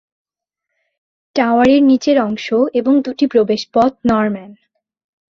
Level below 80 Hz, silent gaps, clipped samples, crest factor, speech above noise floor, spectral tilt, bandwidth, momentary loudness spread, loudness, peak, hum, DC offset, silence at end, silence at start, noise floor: -52 dBFS; none; under 0.1%; 14 dB; 66 dB; -6 dB/octave; 7.2 kHz; 7 LU; -14 LUFS; -2 dBFS; none; under 0.1%; 0.75 s; 1.35 s; -80 dBFS